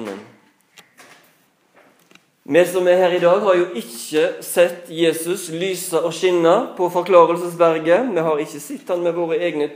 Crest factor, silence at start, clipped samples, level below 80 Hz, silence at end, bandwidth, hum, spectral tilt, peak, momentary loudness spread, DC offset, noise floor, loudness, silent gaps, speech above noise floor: 18 dB; 0 s; under 0.1%; -82 dBFS; 0 s; 15.5 kHz; none; -4.5 dB/octave; 0 dBFS; 9 LU; under 0.1%; -58 dBFS; -18 LUFS; none; 41 dB